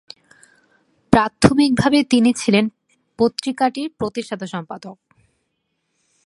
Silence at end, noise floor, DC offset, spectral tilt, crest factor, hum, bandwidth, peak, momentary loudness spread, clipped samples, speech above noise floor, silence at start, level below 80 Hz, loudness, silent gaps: 1.35 s; -72 dBFS; under 0.1%; -5.5 dB/octave; 20 dB; none; 11.5 kHz; 0 dBFS; 14 LU; under 0.1%; 55 dB; 1.1 s; -46 dBFS; -18 LUFS; none